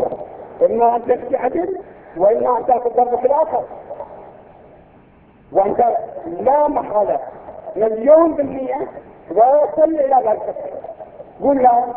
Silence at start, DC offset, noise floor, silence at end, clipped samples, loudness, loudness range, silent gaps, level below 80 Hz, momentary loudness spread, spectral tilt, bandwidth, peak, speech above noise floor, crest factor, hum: 0 s; under 0.1%; -48 dBFS; 0 s; under 0.1%; -17 LUFS; 5 LU; none; -52 dBFS; 19 LU; -11 dB/octave; 3.5 kHz; 0 dBFS; 32 dB; 18 dB; none